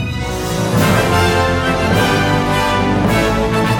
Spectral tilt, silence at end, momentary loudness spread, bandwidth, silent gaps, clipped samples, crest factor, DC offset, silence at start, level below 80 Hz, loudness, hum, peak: -5.5 dB/octave; 0 s; 5 LU; 17 kHz; none; under 0.1%; 12 dB; under 0.1%; 0 s; -30 dBFS; -14 LUFS; none; -2 dBFS